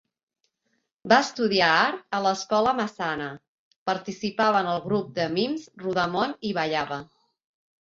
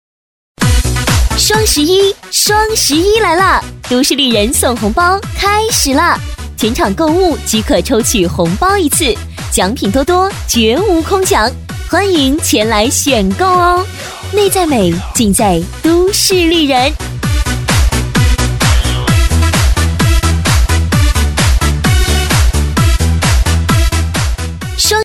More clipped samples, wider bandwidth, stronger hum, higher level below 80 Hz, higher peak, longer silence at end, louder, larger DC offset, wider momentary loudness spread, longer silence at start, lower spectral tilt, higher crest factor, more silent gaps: neither; second, 7.8 kHz vs 18 kHz; neither; second, -64 dBFS vs -18 dBFS; second, -4 dBFS vs 0 dBFS; first, 0.9 s vs 0 s; second, -25 LUFS vs -11 LUFS; neither; first, 12 LU vs 5 LU; first, 1.05 s vs 0.6 s; about the same, -4.5 dB/octave vs -4 dB/octave; first, 22 dB vs 10 dB; first, 3.48-3.86 s vs none